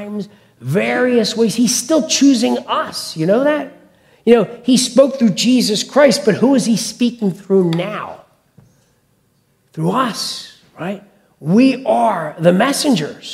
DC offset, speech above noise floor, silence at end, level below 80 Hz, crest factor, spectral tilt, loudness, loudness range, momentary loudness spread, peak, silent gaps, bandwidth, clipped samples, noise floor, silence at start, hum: under 0.1%; 45 dB; 0 s; -62 dBFS; 16 dB; -4.5 dB/octave; -15 LUFS; 8 LU; 15 LU; 0 dBFS; none; 15.5 kHz; under 0.1%; -59 dBFS; 0 s; none